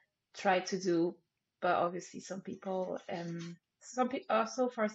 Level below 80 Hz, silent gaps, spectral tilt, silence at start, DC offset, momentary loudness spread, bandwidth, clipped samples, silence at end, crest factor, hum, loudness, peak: -84 dBFS; none; -4 dB/octave; 0.35 s; under 0.1%; 12 LU; 8 kHz; under 0.1%; 0 s; 18 dB; none; -35 LUFS; -16 dBFS